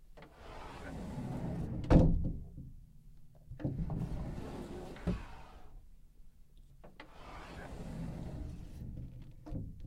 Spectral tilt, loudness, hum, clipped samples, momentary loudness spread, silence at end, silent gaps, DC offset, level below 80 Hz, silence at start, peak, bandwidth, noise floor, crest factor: -8.5 dB/octave; -38 LUFS; none; under 0.1%; 23 LU; 0 s; none; under 0.1%; -42 dBFS; 0 s; -12 dBFS; 12 kHz; -57 dBFS; 26 dB